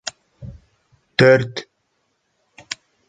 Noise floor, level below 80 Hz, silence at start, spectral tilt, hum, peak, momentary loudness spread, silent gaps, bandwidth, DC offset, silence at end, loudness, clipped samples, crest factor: -69 dBFS; -52 dBFS; 0.4 s; -5 dB/octave; none; -2 dBFS; 26 LU; none; 9.2 kHz; under 0.1%; 1.45 s; -16 LUFS; under 0.1%; 20 dB